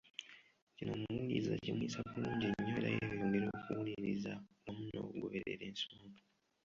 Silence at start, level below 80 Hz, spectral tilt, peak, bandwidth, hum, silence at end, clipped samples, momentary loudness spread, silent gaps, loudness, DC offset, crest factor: 0.05 s; -68 dBFS; -5 dB/octave; -24 dBFS; 7.4 kHz; none; 0.45 s; under 0.1%; 12 LU; 0.62-0.67 s; -41 LUFS; under 0.1%; 18 dB